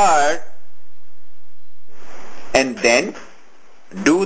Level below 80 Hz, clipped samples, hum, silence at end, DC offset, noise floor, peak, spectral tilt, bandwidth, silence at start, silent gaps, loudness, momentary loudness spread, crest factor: -50 dBFS; under 0.1%; none; 0 s; under 0.1%; -58 dBFS; 0 dBFS; -3 dB/octave; 8 kHz; 0 s; none; -17 LUFS; 24 LU; 18 dB